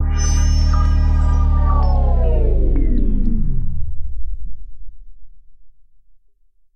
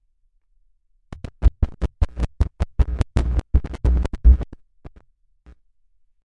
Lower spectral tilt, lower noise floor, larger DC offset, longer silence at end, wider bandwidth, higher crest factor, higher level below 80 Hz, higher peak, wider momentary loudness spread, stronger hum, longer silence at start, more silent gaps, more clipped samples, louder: second, -6.5 dB/octave vs -8 dB/octave; second, -51 dBFS vs -62 dBFS; neither; second, 0.95 s vs 1.5 s; first, 6.8 kHz vs 6 kHz; second, 12 dB vs 18 dB; first, -16 dBFS vs -22 dBFS; about the same, -4 dBFS vs -4 dBFS; first, 14 LU vs 8 LU; neither; second, 0 s vs 1.1 s; neither; neither; first, -19 LUFS vs -23 LUFS